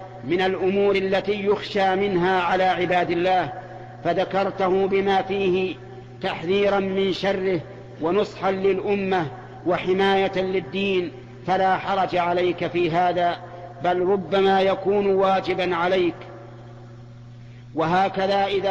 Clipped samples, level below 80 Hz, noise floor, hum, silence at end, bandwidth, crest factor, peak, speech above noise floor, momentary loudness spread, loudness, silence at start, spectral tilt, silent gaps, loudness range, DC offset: under 0.1%; -54 dBFS; -41 dBFS; none; 0 s; 7.6 kHz; 12 dB; -10 dBFS; 20 dB; 11 LU; -22 LUFS; 0 s; -6.5 dB/octave; none; 3 LU; under 0.1%